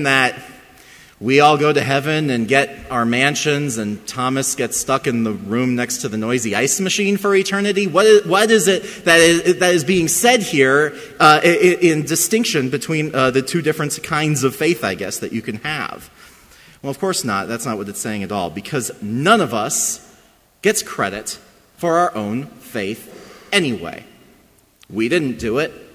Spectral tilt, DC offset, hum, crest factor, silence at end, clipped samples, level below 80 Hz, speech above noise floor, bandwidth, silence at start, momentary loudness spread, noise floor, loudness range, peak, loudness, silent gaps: -3.5 dB/octave; under 0.1%; none; 18 dB; 0.1 s; under 0.1%; -52 dBFS; 35 dB; 16 kHz; 0 s; 12 LU; -53 dBFS; 9 LU; 0 dBFS; -17 LUFS; none